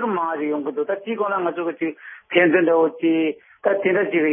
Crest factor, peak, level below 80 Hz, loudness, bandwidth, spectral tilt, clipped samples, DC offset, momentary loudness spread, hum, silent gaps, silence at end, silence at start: 18 dB; -2 dBFS; -80 dBFS; -21 LUFS; 3.6 kHz; -10.5 dB/octave; under 0.1%; under 0.1%; 9 LU; none; none; 0 s; 0 s